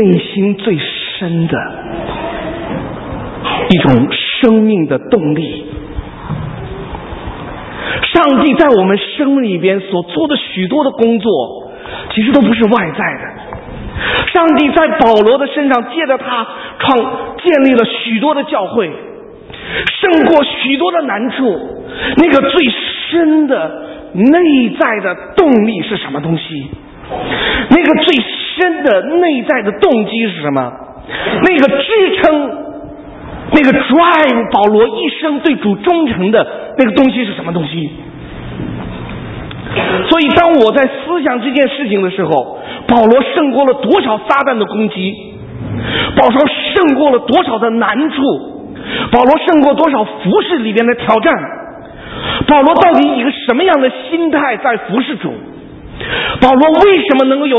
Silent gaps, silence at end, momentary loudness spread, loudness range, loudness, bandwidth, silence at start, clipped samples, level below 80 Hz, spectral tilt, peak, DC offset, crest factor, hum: none; 0 s; 17 LU; 3 LU; -11 LUFS; 6 kHz; 0 s; 0.2%; -38 dBFS; -8 dB/octave; 0 dBFS; under 0.1%; 12 dB; none